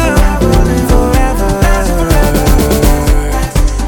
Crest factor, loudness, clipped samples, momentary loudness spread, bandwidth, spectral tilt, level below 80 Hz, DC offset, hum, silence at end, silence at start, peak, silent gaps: 8 dB; -11 LUFS; under 0.1%; 3 LU; 19 kHz; -5.5 dB/octave; -12 dBFS; under 0.1%; none; 0 s; 0 s; 0 dBFS; none